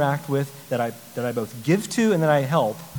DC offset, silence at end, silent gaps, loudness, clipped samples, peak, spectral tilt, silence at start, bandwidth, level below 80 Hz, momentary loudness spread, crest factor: 0.1%; 0 s; none; -23 LUFS; under 0.1%; -4 dBFS; -6 dB/octave; 0 s; 19.5 kHz; -66 dBFS; 8 LU; 18 dB